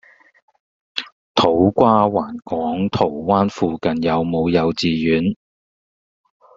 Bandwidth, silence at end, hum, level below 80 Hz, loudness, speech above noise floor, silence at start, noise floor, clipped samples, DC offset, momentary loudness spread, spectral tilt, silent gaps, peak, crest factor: 7.6 kHz; 1.2 s; none; -52 dBFS; -18 LUFS; over 73 dB; 0.95 s; under -90 dBFS; under 0.1%; under 0.1%; 12 LU; -5 dB/octave; 1.12-1.35 s; 0 dBFS; 18 dB